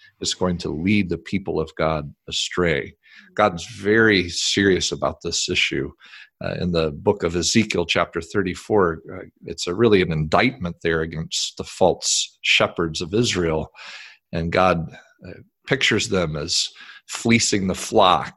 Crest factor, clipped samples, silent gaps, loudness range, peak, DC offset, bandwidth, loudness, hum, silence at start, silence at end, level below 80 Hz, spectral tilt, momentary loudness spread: 20 dB; under 0.1%; none; 3 LU; -2 dBFS; under 0.1%; 12.5 kHz; -21 LUFS; none; 0.2 s; 0.05 s; -42 dBFS; -4 dB/octave; 11 LU